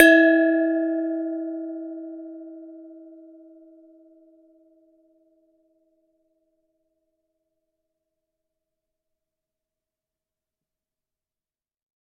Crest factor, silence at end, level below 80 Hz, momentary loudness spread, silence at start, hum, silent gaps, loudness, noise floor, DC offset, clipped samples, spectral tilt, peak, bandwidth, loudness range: 26 dB; 9.15 s; -86 dBFS; 27 LU; 0 s; none; none; -21 LUFS; under -90 dBFS; under 0.1%; under 0.1%; 0.5 dB/octave; 0 dBFS; 6.4 kHz; 26 LU